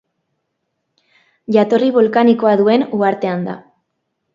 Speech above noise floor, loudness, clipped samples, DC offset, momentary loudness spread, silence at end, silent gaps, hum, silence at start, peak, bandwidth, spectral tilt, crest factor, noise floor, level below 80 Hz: 59 dB; -14 LUFS; under 0.1%; under 0.1%; 13 LU; 0.75 s; none; none; 1.5 s; 0 dBFS; 7.4 kHz; -8 dB/octave; 16 dB; -72 dBFS; -64 dBFS